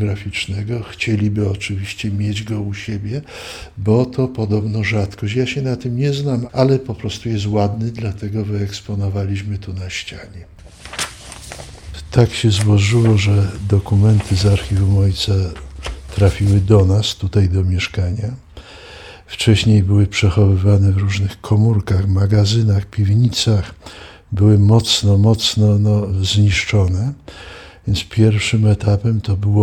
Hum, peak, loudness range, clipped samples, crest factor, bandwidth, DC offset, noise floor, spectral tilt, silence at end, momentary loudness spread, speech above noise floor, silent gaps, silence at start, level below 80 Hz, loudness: none; -2 dBFS; 7 LU; under 0.1%; 14 dB; 11.5 kHz; under 0.1%; -37 dBFS; -6 dB/octave; 0 s; 17 LU; 22 dB; none; 0 s; -36 dBFS; -17 LUFS